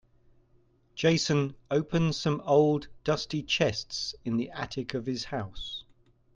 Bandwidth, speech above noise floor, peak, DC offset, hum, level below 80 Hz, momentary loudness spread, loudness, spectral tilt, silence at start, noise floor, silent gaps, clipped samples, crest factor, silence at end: 9.2 kHz; 36 dB; -12 dBFS; under 0.1%; none; -56 dBFS; 11 LU; -29 LUFS; -5 dB/octave; 0.95 s; -64 dBFS; none; under 0.1%; 18 dB; 0.55 s